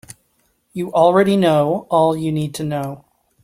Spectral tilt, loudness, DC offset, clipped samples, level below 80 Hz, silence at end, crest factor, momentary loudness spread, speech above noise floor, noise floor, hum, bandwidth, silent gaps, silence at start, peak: -6.5 dB/octave; -17 LUFS; under 0.1%; under 0.1%; -58 dBFS; 0.5 s; 16 dB; 15 LU; 47 dB; -64 dBFS; none; 16 kHz; none; 0.1 s; -2 dBFS